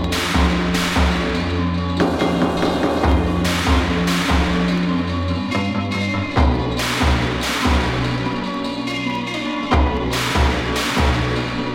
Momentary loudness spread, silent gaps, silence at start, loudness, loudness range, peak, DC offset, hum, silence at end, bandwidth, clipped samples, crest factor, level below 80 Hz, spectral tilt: 5 LU; none; 0 s; -19 LUFS; 2 LU; -4 dBFS; under 0.1%; none; 0 s; 16.5 kHz; under 0.1%; 16 dB; -26 dBFS; -5.5 dB/octave